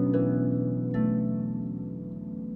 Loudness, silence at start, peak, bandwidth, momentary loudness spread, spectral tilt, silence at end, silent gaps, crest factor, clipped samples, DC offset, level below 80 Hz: -29 LUFS; 0 s; -14 dBFS; 3.1 kHz; 11 LU; -13 dB/octave; 0 s; none; 14 dB; under 0.1%; under 0.1%; -54 dBFS